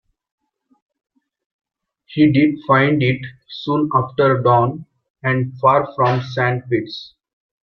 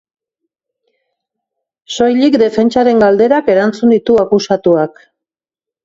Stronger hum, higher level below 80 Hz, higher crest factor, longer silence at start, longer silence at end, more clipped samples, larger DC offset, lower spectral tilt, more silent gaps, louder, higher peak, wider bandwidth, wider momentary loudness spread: neither; about the same, -56 dBFS vs -52 dBFS; first, 18 dB vs 12 dB; first, 2.1 s vs 1.9 s; second, 0.65 s vs 0.95 s; neither; neither; first, -8.5 dB/octave vs -6 dB/octave; first, 5.10-5.15 s vs none; second, -17 LUFS vs -11 LUFS; about the same, -2 dBFS vs 0 dBFS; second, 6.2 kHz vs 7.8 kHz; first, 15 LU vs 5 LU